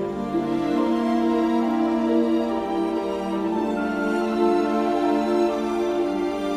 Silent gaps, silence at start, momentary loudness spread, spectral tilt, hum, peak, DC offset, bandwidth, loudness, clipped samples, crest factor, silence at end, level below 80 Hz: none; 0 s; 4 LU; -6.5 dB/octave; none; -8 dBFS; under 0.1%; 12 kHz; -23 LUFS; under 0.1%; 14 dB; 0 s; -52 dBFS